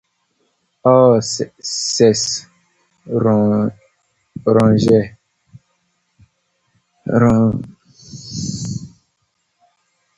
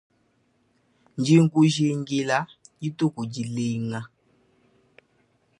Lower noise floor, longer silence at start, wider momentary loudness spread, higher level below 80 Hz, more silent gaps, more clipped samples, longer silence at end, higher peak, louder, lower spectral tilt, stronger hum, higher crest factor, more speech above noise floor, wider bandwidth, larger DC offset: about the same, -68 dBFS vs -67 dBFS; second, 0.85 s vs 1.15 s; about the same, 18 LU vs 17 LU; first, -48 dBFS vs -68 dBFS; neither; neither; second, 1.3 s vs 1.55 s; first, 0 dBFS vs -6 dBFS; first, -16 LUFS vs -24 LUFS; about the same, -5.5 dB/octave vs -6 dB/octave; neither; about the same, 18 dB vs 20 dB; first, 54 dB vs 44 dB; second, 9.2 kHz vs 11 kHz; neither